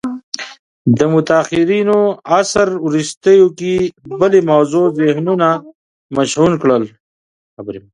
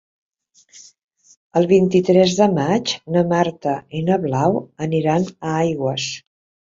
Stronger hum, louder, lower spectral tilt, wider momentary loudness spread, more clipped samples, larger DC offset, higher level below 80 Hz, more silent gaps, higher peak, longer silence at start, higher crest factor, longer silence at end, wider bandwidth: neither; first, -14 LUFS vs -18 LUFS; about the same, -5.5 dB/octave vs -6 dB/octave; first, 14 LU vs 9 LU; neither; neither; first, -50 dBFS vs -58 dBFS; first, 0.23-0.32 s, 0.59-0.85 s, 3.17-3.21 s, 5.75-6.09 s, 7.00-7.57 s vs 1.04-1.08 s, 1.37-1.50 s; about the same, 0 dBFS vs -2 dBFS; second, 0.05 s vs 0.75 s; about the same, 14 dB vs 18 dB; second, 0.15 s vs 0.55 s; first, 11 kHz vs 7.8 kHz